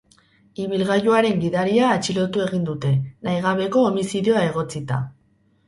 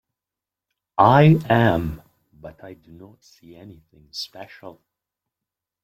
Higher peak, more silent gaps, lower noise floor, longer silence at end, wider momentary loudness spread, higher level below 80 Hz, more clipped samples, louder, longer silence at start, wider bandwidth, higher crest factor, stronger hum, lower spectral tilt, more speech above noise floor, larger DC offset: about the same, -4 dBFS vs -2 dBFS; neither; second, -61 dBFS vs -88 dBFS; second, 0.55 s vs 1.15 s; second, 9 LU vs 26 LU; second, -56 dBFS vs -50 dBFS; neither; second, -21 LUFS vs -17 LUFS; second, 0.6 s vs 1 s; second, 11.5 kHz vs 14 kHz; about the same, 18 dB vs 22 dB; neither; second, -6 dB/octave vs -8 dB/octave; second, 41 dB vs 68 dB; neither